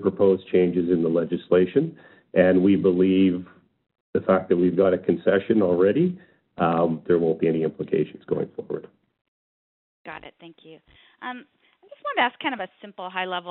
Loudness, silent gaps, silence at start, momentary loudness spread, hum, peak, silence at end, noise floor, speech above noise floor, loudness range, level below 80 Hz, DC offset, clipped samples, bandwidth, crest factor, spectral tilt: -22 LUFS; 4.01-4.13 s, 9.21-10.04 s; 0 s; 17 LU; none; -4 dBFS; 0 s; under -90 dBFS; over 68 dB; 15 LU; -64 dBFS; under 0.1%; under 0.1%; 4.2 kHz; 20 dB; -6 dB/octave